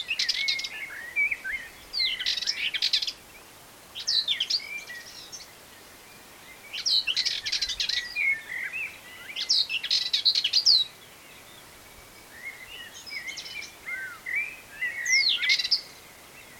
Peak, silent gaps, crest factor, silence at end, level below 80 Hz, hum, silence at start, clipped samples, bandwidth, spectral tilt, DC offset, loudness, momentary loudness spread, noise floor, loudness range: -8 dBFS; none; 22 dB; 0 s; -64 dBFS; none; 0 s; under 0.1%; 17 kHz; 2 dB/octave; under 0.1%; -25 LUFS; 23 LU; -50 dBFS; 8 LU